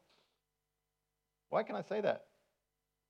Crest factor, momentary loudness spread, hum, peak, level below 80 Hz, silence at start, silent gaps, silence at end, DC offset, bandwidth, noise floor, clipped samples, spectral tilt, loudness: 22 dB; 3 LU; 50 Hz at -70 dBFS; -20 dBFS; under -90 dBFS; 1.5 s; none; 0.9 s; under 0.1%; 8 kHz; -88 dBFS; under 0.1%; -6.5 dB/octave; -38 LUFS